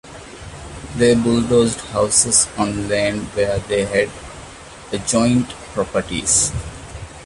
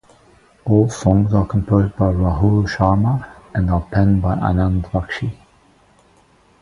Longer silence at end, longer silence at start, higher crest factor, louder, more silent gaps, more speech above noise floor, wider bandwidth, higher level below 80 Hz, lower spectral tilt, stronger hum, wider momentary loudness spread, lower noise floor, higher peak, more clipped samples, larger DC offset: second, 0 s vs 1.3 s; second, 0.05 s vs 0.65 s; about the same, 20 dB vs 18 dB; about the same, -17 LUFS vs -18 LUFS; neither; second, 20 dB vs 37 dB; about the same, 11.5 kHz vs 11 kHz; second, -38 dBFS vs -30 dBFS; second, -3.5 dB/octave vs -8 dB/octave; neither; first, 20 LU vs 9 LU; second, -37 dBFS vs -53 dBFS; about the same, 0 dBFS vs 0 dBFS; neither; neither